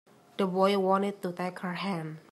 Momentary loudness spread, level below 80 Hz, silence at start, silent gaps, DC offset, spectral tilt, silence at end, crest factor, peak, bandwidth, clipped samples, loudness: 9 LU; -82 dBFS; 0.4 s; none; under 0.1%; -6.5 dB/octave; 0.1 s; 18 dB; -12 dBFS; 14 kHz; under 0.1%; -30 LUFS